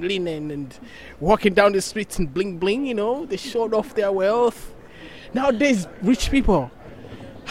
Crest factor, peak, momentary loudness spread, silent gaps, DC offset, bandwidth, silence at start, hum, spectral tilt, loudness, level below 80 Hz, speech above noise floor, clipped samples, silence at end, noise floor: 20 dB; -2 dBFS; 22 LU; none; 0.4%; 16 kHz; 0 s; none; -5 dB/octave; -21 LUFS; -36 dBFS; 20 dB; under 0.1%; 0 s; -41 dBFS